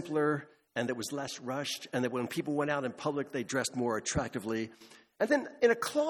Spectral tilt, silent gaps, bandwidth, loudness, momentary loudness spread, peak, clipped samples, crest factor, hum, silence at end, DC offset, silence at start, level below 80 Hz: -4.5 dB/octave; none; 18 kHz; -33 LUFS; 8 LU; -12 dBFS; under 0.1%; 20 dB; none; 0 s; under 0.1%; 0 s; -60 dBFS